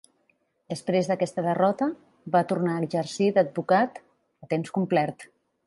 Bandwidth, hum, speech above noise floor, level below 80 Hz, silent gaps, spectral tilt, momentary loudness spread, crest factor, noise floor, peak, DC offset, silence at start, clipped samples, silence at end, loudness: 11.5 kHz; none; 45 dB; -72 dBFS; none; -6.5 dB/octave; 8 LU; 18 dB; -70 dBFS; -8 dBFS; under 0.1%; 0.7 s; under 0.1%; 0.4 s; -26 LUFS